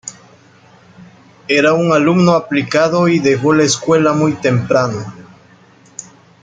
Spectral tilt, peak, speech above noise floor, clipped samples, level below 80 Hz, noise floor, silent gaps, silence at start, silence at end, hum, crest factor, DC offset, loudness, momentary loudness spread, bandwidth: -5.5 dB/octave; 0 dBFS; 33 dB; under 0.1%; -54 dBFS; -46 dBFS; none; 0.05 s; 1.2 s; none; 14 dB; under 0.1%; -13 LUFS; 21 LU; 9.4 kHz